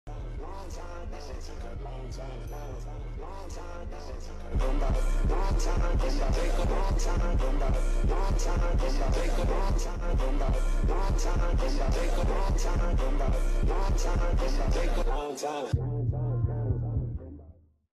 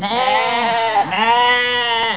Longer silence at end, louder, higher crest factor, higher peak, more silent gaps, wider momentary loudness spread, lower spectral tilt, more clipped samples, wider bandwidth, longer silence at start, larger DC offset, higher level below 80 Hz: first, 0.45 s vs 0 s; second, -32 LUFS vs -15 LUFS; about the same, 12 dB vs 14 dB; second, -16 dBFS vs -4 dBFS; neither; first, 11 LU vs 4 LU; about the same, -6 dB/octave vs -6 dB/octave; neither; first, 11 kHz vs 4 kHz; about the same, 0.05 s vs 0 s; second, under 0.1% vs 0.4%; first, -28 dBFS vs -60 dBFS